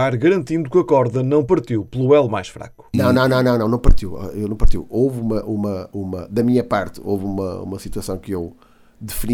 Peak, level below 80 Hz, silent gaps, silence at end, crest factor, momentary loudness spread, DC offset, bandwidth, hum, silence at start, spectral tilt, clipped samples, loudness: -2 dBFS; -24 dBFS; none; 0 s; 16 dB; 12 LU; under 0.1%; 18 kHz; none; 0 s; -7 dB/octave; under 0.1%; -19 LUFS